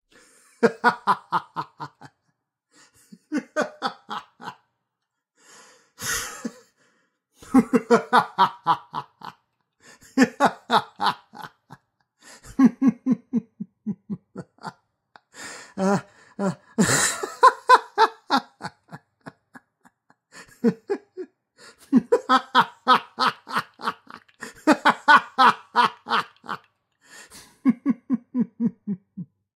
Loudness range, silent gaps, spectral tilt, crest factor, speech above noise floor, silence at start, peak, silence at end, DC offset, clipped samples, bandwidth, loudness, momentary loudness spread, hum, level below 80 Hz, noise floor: 12 LU; none; -4 dB/octave; 22 dB; 62 dB; 0.6 s; -2 dBFS; 0.3 s; under 0.1%; under 0.1%; 16 kHz; -22 LUFS; 22 LU; none; -64 dBFS; -82 dBFS